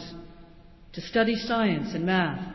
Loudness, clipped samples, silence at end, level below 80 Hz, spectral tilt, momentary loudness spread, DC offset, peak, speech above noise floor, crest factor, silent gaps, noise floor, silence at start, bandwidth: -26 LUFS; under 0.1%; 0 s; -52 dBFS; -6.5 dB/octave; 18 LU; under 0.1%; -12 dBFS; 24 dB; 16 dB; none; -50 dBFS; 0 s; 6.2 kHz